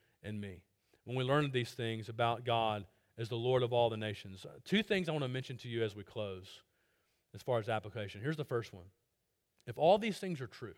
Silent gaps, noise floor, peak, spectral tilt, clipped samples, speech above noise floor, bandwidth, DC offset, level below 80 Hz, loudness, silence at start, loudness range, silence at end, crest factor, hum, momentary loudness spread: none; -83 dBFS; -18 dBFS; -6 dB/octave; under 0.1%; 47 dB; 16.5 kHz; under 0.1%; -72 dBFS; -36 LUFS; 0.25 s; 6 LU; 0.05 s; 20 dB; none; 17 LU